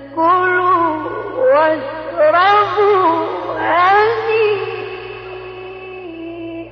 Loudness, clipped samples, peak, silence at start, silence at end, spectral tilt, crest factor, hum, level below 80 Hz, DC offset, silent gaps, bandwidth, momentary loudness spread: -14 LUFS; under 0.1%; -2 dBFS; 0 s; 0 s; -6.5 dB/octave; 12 dB; none; -52 dBFS; under 0.1%; none; 6.4 kHz; 18 LU